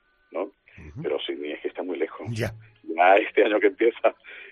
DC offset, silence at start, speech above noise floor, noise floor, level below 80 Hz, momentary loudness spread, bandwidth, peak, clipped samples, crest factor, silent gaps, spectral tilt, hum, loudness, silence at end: under 0.1%; 0.3 s; 23 dB; -46 dBFS; -60 dBFS; 18 LU; 13.5 kHz; -6 dBFS; under 0.1%; 20 dB; none; -6 dB/octave; none; -24 LUFS; 0 s